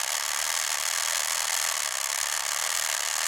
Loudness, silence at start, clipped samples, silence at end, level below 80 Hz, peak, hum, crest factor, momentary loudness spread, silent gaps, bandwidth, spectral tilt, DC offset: -25 LUFS; 0 s; under 0.1%; 0 s; -66 dBFS; -10 dBFS; none; 18 dB; 1 LU; none; 17 kHz; 4 dB/octave; under 0.1%